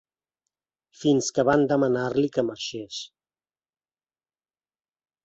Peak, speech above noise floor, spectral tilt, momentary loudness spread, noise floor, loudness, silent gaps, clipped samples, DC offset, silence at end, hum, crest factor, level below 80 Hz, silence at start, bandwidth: -8 dBFS; over 67 dB; -5 dB/octave; 14 LU; under -90 dBFS; -24 LUFS; none; under 0.1%; under 0.1%; 2.2 s; none; 20 dB; -64 dBFS; 1 s; 8.2 kHz